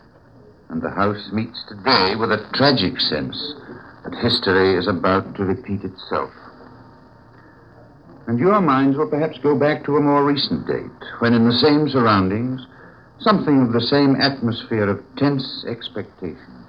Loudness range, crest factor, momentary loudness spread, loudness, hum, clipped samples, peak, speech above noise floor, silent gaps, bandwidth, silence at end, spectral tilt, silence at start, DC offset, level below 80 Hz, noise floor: 5 LU; 18 dB; 14 LU; -19 LUFS; none; under 0.1%; -2 dBFS; 29 dB; none; 8 kHz; 0.05 s; -8 dB/octave; 0.7 s; under 0.1%; -54 dBFS; -48 dBFS